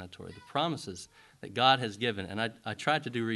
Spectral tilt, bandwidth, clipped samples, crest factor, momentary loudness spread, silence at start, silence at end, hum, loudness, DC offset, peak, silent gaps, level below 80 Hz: -4.5 dB/octave; 12.5 kHz; under 0.1%; 22 dB; 21 LU; 0 s; 0 s; none; -31 LUFS; under 0.1%; -10 dBFS; none; -62 dBFS